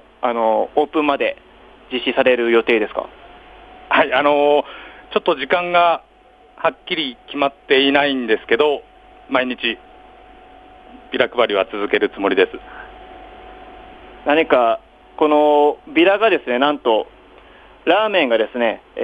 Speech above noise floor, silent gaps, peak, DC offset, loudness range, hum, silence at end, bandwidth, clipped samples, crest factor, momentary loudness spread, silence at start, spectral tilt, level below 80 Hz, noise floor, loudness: 31 dB; none; 0 dBFS; under 0.1%; 4 LU; none; 0 s; 5 kHz; under 0.1%; 18 dB; 12 LU; 0.2 s; -6 dB/octave; -54 dBFS; -48 dBFS; -17 LUFS